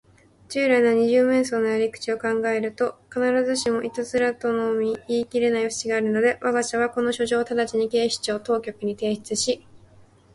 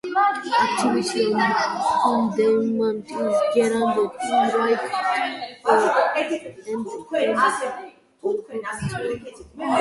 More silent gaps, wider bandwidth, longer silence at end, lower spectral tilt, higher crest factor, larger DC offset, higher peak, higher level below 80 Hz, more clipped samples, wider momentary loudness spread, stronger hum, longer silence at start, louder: neither; about the same, 11.5 kHz vs 11.5 kHz; first, 0.6 s vs 0 s; about the same, -3.5 dB/octave vs -4.5 dB/octave; about the same, 16 dB vs 18 dB; neither; second, -8 dBFS vs -4 dBFS; about the same, -62 dBFS vs -58 dBFS; neither; second, 8 LU vs 11 LU; neither; first, 0.5 s vs 0.05 s; about the same, -23 LUFS vs -22 LUFS